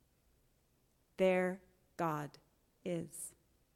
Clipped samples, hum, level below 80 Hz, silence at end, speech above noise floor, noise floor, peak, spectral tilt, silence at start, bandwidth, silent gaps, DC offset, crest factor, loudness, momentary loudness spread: under 0.1%; none; -74 dBFS; 0.45 s; 38 dB; -75 dBFS; -20 dBFS; -5.5 dB/octave; 1.2 s; 16 kHz; none; under 0.1%; 20 dB; -38 LUFS; 18 LU